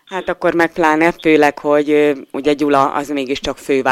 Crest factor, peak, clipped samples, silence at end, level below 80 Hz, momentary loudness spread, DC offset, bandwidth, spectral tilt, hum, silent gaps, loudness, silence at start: 14 dB; 0 dBFS; under 0.1%; 0 s; -46 dBFS; 8 LU; under 0.1%; 15 kHz; -5 dB/octave; none; none; -15 LUFS; 0.1 s